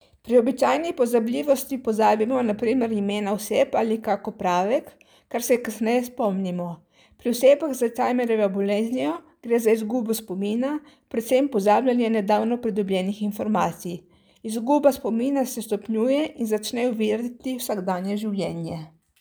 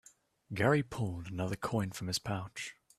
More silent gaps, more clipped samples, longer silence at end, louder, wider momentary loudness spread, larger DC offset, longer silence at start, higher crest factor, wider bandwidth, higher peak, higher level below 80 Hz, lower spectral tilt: neither; neither; about the same, 0.3 s vs 0.25 s; first, -23 LUFS vs -35 LUFS; about the same, 10 LU vs 12 LU; neither; second, 0.25 s vs 0.5 s; about the same, 18 dB vs 20 dB; first, over 20 kHz vs 14.5 kHz; first, -6 dBFS vs -14 dBFS; about the same, -64 dBFS vs -62 dBFS; about the same, -5.5 dB/octave vs -5 dB/octave